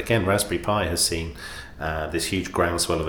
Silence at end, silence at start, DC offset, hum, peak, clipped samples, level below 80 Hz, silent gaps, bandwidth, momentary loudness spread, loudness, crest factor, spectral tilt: 0 s; 0 s; under 0.1%; none; -6 dBFS; under 0.1%; -40 dBFS; none; 20 kHz; 12 LU; -24 LUFS; 18 dB; -3.5 dB/octave